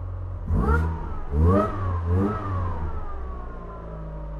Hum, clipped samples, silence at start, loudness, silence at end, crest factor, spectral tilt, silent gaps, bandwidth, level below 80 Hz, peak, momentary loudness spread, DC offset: none; under 0.1%; 0 s; -26 LUFS; 0 s; 16 dB; -10 dB/octave; none; 4.5 kHz; -30 dBFS; -8 dBFS; 16 LU; under 0.1%